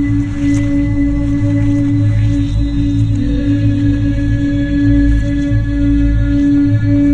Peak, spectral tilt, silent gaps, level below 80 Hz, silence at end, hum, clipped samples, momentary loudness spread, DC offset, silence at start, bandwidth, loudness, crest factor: -2 dBFS; -8.5 dB/octave; none; -18 dBFS; 0 s; none; under 0.1%; 3 LU; 0.3%; 0 s; 8 kHz; -14 LUFS; 10 dB